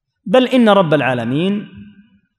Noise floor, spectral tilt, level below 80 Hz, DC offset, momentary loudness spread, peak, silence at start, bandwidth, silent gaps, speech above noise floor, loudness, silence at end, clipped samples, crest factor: -48 dBFS; -7 dB/octave; -62 dBFS; under 0.1%; 8 LU; 0 dBFS; 0.25 s; 11 kHz; none; 34 dB; -14 LUFS; 0.5 s; under 0.1%; 14 dB